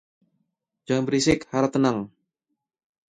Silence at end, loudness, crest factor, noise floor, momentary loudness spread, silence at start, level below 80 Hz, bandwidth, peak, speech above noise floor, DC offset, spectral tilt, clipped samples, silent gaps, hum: 1 s; -23 LUFS; 20 dB; -81 dBFS; 8 LU; 0.9 s; -52 dBFS; 10.5 kHz; -6 dBFS; 59 dB; under 0.1%; -5 dB/octave; under 0.1%; none; none